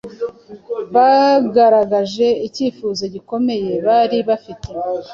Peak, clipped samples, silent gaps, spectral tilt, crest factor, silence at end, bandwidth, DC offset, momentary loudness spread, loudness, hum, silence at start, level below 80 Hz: -2 dBFS; under 0.1%; none; -5.5 dB/octave; 14 dB; 0 s; 7.4 kHz; under 0.1%; 15 LU; -16 LUFS; none; 0.05 s; -50 dBFS